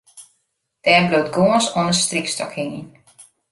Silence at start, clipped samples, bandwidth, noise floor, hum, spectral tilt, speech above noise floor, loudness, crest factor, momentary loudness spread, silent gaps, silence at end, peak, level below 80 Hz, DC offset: 0.15 s; under 0.1%; 11.5 kHz; -71 dBFS; none; -3.5 dB/octave; 53 dB; -18 LUFS; 18 dB; 13 LU; none; 0.3 s; -2 dBFS; -58 dBFS; under 0.1%